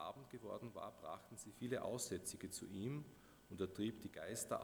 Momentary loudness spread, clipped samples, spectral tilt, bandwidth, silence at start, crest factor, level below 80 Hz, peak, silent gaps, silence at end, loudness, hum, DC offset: 10 LU; under 0.1%; -4.5 dB/octave; over 20 kHz; 0 s; 20 dB; -76 dBFS; -28 dBFS; none; 0 s; -48 LUFS; none; under 0.1%